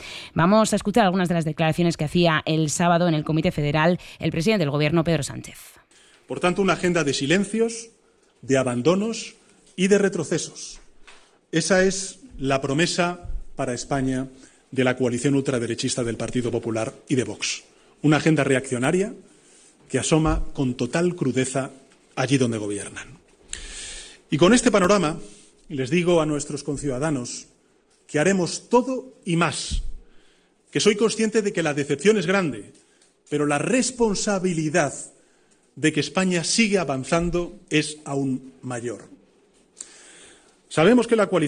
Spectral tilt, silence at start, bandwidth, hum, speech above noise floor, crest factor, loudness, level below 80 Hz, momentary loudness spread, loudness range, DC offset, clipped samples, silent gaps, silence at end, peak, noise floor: -5 dB/octave; 0 s; 13 kHz; none; 39 dB; 18 dB; -22 LUFS; -44 dBFS; 14 LU; 4 LU; under 0.1%; under 0.1%; none; 0 s; -6 dBFS; -61 dBFS